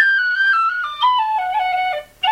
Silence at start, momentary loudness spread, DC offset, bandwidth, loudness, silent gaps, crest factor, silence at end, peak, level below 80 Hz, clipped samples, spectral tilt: 0 s; 6 LU; under 0.1%; 16 kHz; -17 LUFS; none; 14 dB; 0 s; -2 dBFS; -58 dBFS; under 0.1%; 0 dB/octave